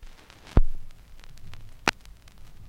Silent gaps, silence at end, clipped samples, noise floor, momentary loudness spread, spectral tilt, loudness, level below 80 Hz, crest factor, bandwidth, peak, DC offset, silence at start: none; 0.75 s; under 0.1%; -47 dBFS; 24 LU; -5 dB/octave; -29 LUFS; -30 dBFS; 24 dB; 9.2 kHz; -4 dBFS; under 0.1%; 0.05 s